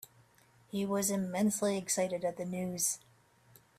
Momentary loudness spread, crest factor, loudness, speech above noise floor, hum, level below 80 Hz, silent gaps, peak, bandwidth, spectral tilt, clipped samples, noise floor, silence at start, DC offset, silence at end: 7 LU; 16 dB; -33 LUFS; 32 dB; none; -74 dBFS; none; -18 dBFS; 16 kHz; -4 dB/octave; under 0.1%; -65 dBFS; 0.75 s; under 0.1%; 0.8 s